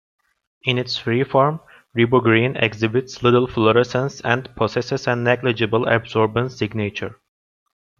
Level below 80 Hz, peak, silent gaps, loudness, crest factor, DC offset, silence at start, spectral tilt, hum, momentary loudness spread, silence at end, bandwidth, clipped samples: -54 dBFS; -2 dBFS; none; -19 LUFS; 18 dB; under 0.1%; 0.65 s; -6.5 dB/octave; none; 8 LU; 0.85 s; 7.4 kHz; under 0.1%